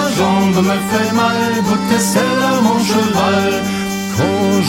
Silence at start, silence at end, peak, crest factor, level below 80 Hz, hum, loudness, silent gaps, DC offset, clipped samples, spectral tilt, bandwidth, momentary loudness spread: 0 s; 0 s; 0 dBFS; 14 dB; -46 dBFS; none; -14 LUFS; none; under 0.1%; under 0.1%; -4.5 dB/octave; 16.5 kHz; 4 LU